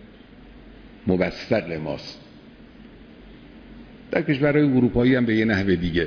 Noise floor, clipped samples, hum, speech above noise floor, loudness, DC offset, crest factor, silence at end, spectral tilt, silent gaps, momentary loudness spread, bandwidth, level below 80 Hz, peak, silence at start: -46 dBFS; under 0.1%; none; 25 dB; -22 LUFS; under 0.1%; 18 dB; 0 s; -8 dB/octave; none; 13 LU; 5.4 kHz; -44 dBFS; -4 dBFS; 0 s